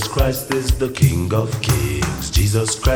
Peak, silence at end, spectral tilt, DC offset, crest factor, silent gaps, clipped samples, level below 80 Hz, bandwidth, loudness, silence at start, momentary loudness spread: -2 dBFS; 0 s; -5 dB/octave; under 0.1%; 16 dB; none; under 0.1%; -24 dBFS; 17.5 kHz; -19 LUFS; 0 s; 4 LU